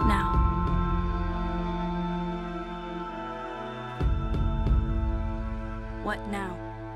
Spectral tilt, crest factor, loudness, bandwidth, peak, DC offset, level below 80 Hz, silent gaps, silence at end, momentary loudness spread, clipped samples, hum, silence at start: -8 dB/octave; 18 dB; -31 LUFS; 10.5 kHz; -10 dBFS; under 0.1%; -32 dBFS; none; 0 s; 10 LU; under 0.1%; none; 0 s